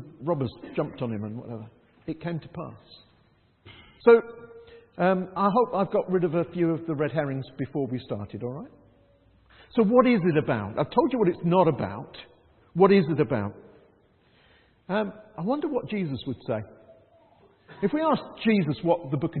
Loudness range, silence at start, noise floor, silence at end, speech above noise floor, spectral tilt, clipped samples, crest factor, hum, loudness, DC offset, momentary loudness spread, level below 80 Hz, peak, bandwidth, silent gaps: 8 LU; 0 s; -63 dBFS; 0 s; 38 dB; -11.5 dB/octave; under 0.1%; 22 dB; none; -26 LUFS; under 0.1%; 19 LU; -62 dBFS; -4 dBFS; 4.4 kHz; none